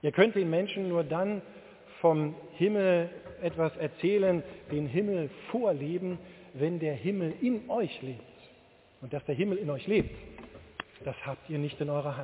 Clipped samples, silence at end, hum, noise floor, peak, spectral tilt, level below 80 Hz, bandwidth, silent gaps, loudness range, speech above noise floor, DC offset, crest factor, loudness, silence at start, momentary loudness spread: under 0.1%; 0 s; none; -60 dBFS; -10 dBFS; -6 dB/octave; -60 dBFS; 4 kHz; none; 5 LU; 30 dB; under 0.1%; 22 dB; -31 LUFS; 0.05 s; 16 LU